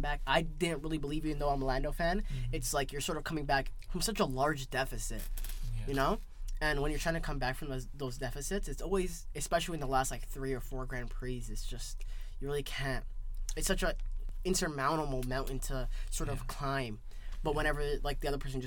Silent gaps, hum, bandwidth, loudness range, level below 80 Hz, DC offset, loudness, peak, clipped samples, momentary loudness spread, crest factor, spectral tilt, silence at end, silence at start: none; none; 19 kHz; 4 LU; -38 dBFS; under 0.1%; -36 LUFS; -14 dBFS; under 0.1%; 10 LU; 20 dB; -4 dB/octave; 0 s; 0 s